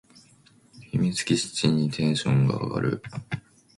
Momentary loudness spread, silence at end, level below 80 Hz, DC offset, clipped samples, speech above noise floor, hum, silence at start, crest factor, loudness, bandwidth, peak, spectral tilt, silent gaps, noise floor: 12 LU; 0.4 s; -58 dBFS; under 0.1%; under 0.1%; 33 dB; none; 0.75 s; 18 dB; -25 LUFS; 11.5 kHz; -8 dBFS; -5.5 dB/octave; none; -57 dBFS